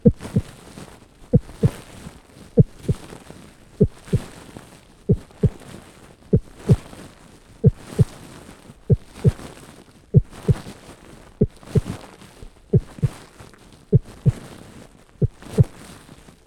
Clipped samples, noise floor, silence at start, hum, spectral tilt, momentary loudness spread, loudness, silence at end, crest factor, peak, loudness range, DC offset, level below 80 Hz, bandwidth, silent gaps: under 0.1%; -47 dBFS; 0.05 s; none; -8.5 dB/octave; 24 LU; -22 LUFS; 0.8 s; 22 dB; 0 dBFS; 3 LU; under 0.1%; -36 dBFS; 12.5 kHz; none